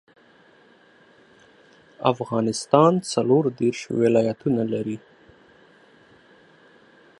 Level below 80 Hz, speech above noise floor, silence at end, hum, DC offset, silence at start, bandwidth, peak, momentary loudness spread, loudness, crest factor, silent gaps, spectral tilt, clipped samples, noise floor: -66 dBFS; 34 dB; 2.2 s; none; under 0.1%; 2 s; 11.5 kHz; 0 dBFS; 9 LU; -22 LUFS; 24 dB; none; -6 dB/octave; under 0.1%; -55 dBFS